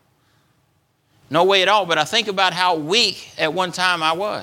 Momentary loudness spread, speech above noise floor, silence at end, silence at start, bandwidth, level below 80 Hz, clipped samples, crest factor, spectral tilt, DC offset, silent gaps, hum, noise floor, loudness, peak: 6 LU; 45 dB; 0 s; 1.3 s; 17 kHz; -66 dBFS; under 0.1%; 20 dB; -2.5 dB/octave; under 0.1%; none; none; -64 dBFS; -18 LUFS; 0 dBFS